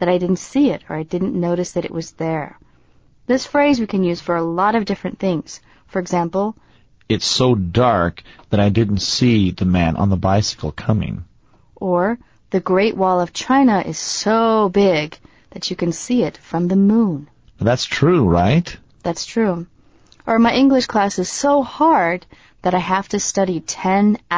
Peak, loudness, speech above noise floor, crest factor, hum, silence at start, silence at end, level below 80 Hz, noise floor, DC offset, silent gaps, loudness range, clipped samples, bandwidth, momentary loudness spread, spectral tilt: -4 dBFS; -18 LUFS; 37 dB; 14 dB; none; 0 s; 0 s; -40 dBFS; -54 dBFS; 0.2%; none; 4 LU; under 0.1%; 8 kHz; 11 LU; -5.5 dB/octave